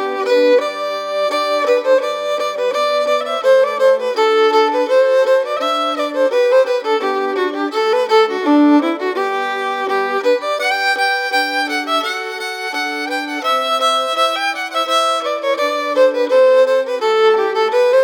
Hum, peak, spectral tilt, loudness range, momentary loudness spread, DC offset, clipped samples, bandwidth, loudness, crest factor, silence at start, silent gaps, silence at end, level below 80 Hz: none; -2 dBFS; -1.5 dB/octave; 3 LU; 7 LU; under 0.1%; under 0.1%; 17.5 kHz; -15 LUFS; 12 dB; 0 s; none; 0 s; -86 dBFS